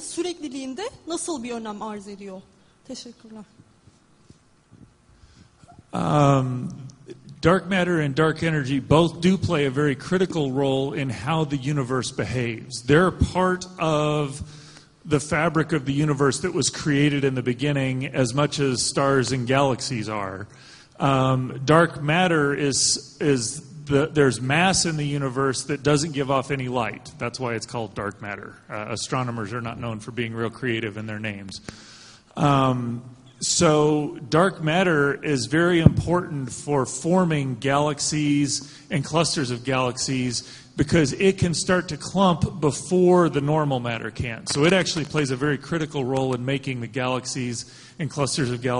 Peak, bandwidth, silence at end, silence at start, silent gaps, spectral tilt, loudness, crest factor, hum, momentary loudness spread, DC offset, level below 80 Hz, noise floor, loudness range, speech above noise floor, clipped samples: 0 dBFS; 10.5 kHz; 0 s; 0 s; none; -5 dB/octave; -23 LUFS; 22 dB; none; 13 LU; under 0.1%; -46 dBFS; -56 dBFS; 8 LU; 33 dB; under 0.1%